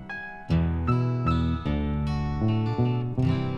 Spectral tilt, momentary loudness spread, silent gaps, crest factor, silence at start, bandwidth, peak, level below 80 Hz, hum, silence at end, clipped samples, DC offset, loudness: -9 dB/octave; 3 LU; none; 14 dB; 0 s; 7 kHz; -12 dBFS; -36 dBFS; none; 0 s; under 0.1%; under 0.1%; -26 LUFS